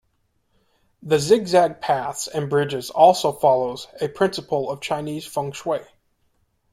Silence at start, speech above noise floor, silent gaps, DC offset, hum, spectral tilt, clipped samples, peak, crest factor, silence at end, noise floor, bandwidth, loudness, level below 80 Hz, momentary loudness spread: 1.05 s; 48 dB; none; under 0.1%; none; -4.5 dB/octave; under 0.1%; -2 dBFS; 20 dB; 0.9 s; -68 dBFS; 16 kHz; -21 LUFS; -60 dBFS; 12 LU